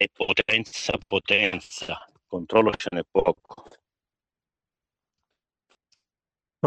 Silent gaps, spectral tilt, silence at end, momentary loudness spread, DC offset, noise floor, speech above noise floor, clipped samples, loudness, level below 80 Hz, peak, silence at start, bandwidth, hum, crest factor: none; -4 dB/octave; 0 s; 14 LU; under 0.1%; under -90 dBFS; over 65 dB; under 0.1%; -24 LUFS; -56 dBFS; -4 dBFS; 0 s; 9 kHz; none; 22 dB